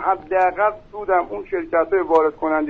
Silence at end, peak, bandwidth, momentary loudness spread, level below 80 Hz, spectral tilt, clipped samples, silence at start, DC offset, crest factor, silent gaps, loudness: 0 s; -4 dBFS; 6.8 kHz; 8 LU; -50 dBFS; -4 dB/octave; under 0.1%; 0 s; under 0.1%; 16 dB; none; -20 LUFS